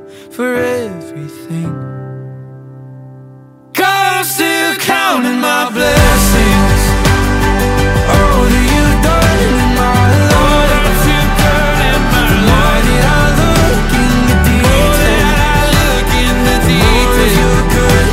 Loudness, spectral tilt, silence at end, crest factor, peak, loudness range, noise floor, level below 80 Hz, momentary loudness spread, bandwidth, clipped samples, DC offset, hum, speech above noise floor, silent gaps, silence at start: -10 LUFS; -4.5 dB/octave; 0 s; 10 dB; 0 dBFS; 7 LU; -37 dBFS; -16 dBFS; 11 LU; 16.5 kHz; under 0.1%; under 0.1%; none; 18 dB; none; 0 s